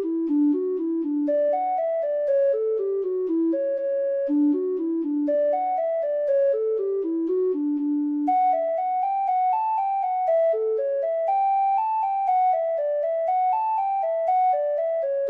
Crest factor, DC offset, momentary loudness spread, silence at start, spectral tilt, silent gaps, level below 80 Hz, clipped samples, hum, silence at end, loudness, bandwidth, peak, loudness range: 8 dB; under 0.1%; 4 LU; 0 s; -7.5 dB/octave; none; -76 dBFS; under 0.1%; none; 0 s; -23 LUFS; 4.1 kHz; -14 dBFS; 1 LU